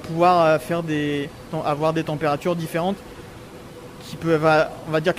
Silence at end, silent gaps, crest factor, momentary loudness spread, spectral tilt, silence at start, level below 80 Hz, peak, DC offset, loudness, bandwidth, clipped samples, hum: 0 s; none; 18 dB; 22 LU; -6.5 dB/octave; 0 s; -52 dBFS; -4 dBFS; under 0.1%; -21 LUFS; 16 kHz; under 0.1%; none